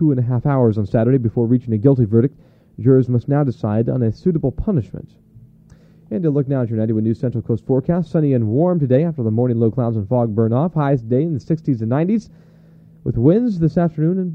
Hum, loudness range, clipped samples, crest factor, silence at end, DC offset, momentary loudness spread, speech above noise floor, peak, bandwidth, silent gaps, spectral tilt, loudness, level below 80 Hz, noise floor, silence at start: none; 5 LU; under 0.1%; 16 dB; 0 s; under 0.1%; 6 LU; 30 dB; -2 dBFS; 5.8 kHz; none; -11.5 dB/octave; -18 LUFS; -42 dBFS; -47 dBFS; 0 s